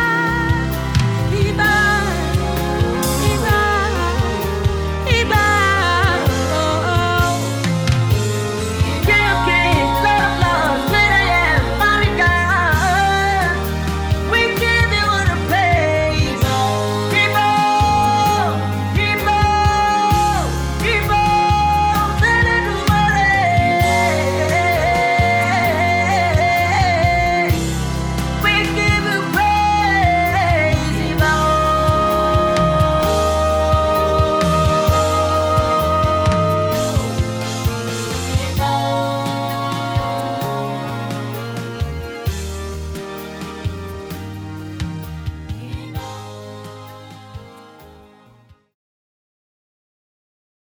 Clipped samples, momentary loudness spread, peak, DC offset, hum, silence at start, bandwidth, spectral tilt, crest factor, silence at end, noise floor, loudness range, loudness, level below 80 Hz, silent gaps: under 0.1%; 12 LU; -2 dBFS; under 0.1%; none; 0 s; over 20 kHz; -5 dB/octave; 16 dB; 2.9 s; -50 dBFS; 12 LU; -16 LUFS; -28 dBFS; none